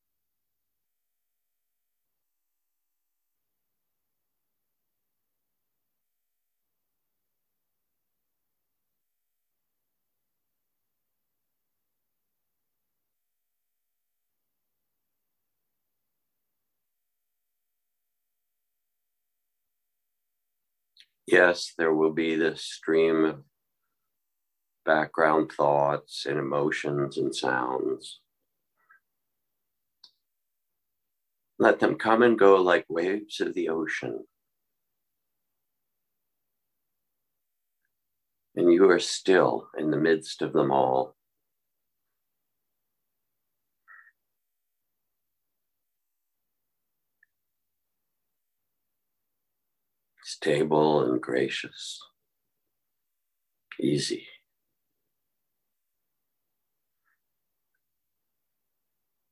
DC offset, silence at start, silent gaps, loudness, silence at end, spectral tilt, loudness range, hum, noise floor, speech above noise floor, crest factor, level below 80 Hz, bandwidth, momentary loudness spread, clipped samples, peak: under 0.1%; 21.3 s; none; -25 LUFS; 5.1 s; -5 dB/octave; 12 LU; none; -85 dBFS; 61 dB; 26 dB; -74 dBFS; 12 kHz; 15 LU; under 0.1%; -6 dBFS